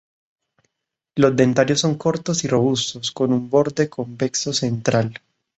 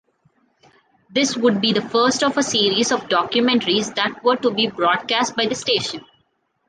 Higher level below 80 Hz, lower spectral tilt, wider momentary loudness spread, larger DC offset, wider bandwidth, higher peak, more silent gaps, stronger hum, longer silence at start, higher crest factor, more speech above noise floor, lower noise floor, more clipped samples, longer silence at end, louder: about the same, -58 dBFS vs -62 dBFS; first, -5 dB/octave vs -3 dB/octave; first, 8 LU vs 4 LU; neither; second, 8.2 kHz vs 10 kHz; about the same, -2 dBFS vs -4 dBFS; neither; neither; about the same, 1.15 s vs 1.1 s; about the same, 18 dB vs 16 dB; first, 62 dB vs 48 dB; first, -81 dBFS vs -67 dBFS; neither; second, 0.45 s vs 0.7 s; about the same, -20 LUFS vs -19 LUFS